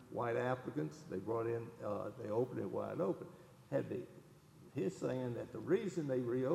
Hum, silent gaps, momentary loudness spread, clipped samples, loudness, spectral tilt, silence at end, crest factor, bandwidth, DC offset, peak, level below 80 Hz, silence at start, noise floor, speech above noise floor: none; none; 9 LU; under 0.1%; -41 LUFS; -7.5 dB/octave; 0 s; 18 dB; 13.5 kHz; under 0.1%; -22 dBFS; -76 dBFS; 0 s; -61 dBFS; 21 dB